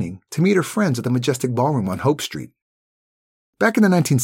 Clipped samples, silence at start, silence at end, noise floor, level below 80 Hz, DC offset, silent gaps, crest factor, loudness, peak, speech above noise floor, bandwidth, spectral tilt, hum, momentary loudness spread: under 0.1%; 0 s; 0 s; under -90 dBFS; -58 dBFS; under 0.1%; 2.62-3.53 s; 16 dB; -19 LUFS; -4 dBFS; over 71 dB; 17 kHz; -6 dB/octave; none; 9 LU